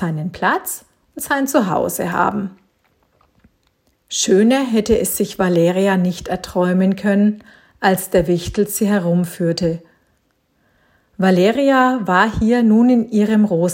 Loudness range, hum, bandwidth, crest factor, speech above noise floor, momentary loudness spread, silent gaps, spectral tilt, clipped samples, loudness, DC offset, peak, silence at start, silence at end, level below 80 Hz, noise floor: 5 LU; none; 16.5 kHz; 16 dB; 47 dB; 9 LU; none; -5.5 dB/octave; under 0.1%; -16 LUFS; under 0.1%; 0 dBFS; 0 s; 0 s; -44 dBFS; -63 dBFS